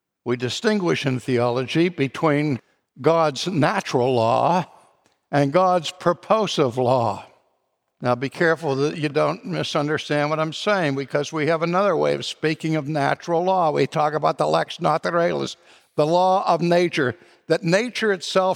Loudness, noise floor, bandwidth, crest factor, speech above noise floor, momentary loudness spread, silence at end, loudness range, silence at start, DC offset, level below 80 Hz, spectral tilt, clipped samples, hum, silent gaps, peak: -21 LUFS; -72 dBFS; 15.5 kHz; 18 dB; 51 dB; 6 LU; 0 s; 2 LU; 0.25 s; under 0.1%; -68 dBFS; -5.5 dB/octave; under 0.1%; none; none; -4 dBFS